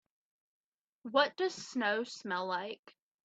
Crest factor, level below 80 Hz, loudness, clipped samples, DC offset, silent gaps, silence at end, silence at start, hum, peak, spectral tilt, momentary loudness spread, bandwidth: 22 dB; -88 dBFS; -34 LUFS; under 0.1%; under 0.1%; 2.79-2.83 s; 0.35 s; 1.05 s; none; -14 dBFS; -3 dB/octave; 14 LU; 8.4 kHz